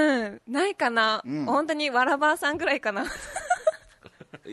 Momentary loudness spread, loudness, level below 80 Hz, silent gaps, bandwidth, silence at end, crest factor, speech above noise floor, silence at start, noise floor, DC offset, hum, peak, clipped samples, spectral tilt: 7 LU; -25 LUFS; -58 dBFS; none; 12.5 kHz; 0 s; 16 dB; 26 dB; 0 s; -51 dBFS; under 0.1%; none; -10 dBFS; under 0.1%; -3.5 dB/octave